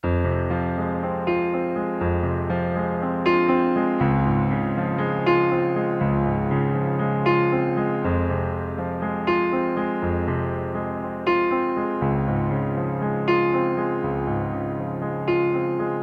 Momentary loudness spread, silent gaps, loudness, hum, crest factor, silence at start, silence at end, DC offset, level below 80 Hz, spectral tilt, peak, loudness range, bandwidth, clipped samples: 6 LU; none; -23 LUFS; none; 14 dB; 0.05 s; 0 s; under 0.1%; -42 dBFS; -10 dB/octave; -8 dBFS; 3 LU; 5.4 kHz; under 0.1%